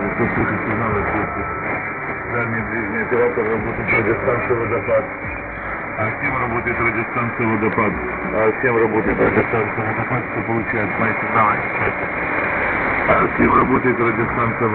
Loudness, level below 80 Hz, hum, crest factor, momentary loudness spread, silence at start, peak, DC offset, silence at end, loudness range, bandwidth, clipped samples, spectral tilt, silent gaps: -19 LUFS; -40 dBFS; none; 18 dB; 7 LU; 0 s; -2 dBFS; under 0.1%; 0 s; 3 LU; 4.3 kHz; under 0.1%; -12.5 dB/octave; none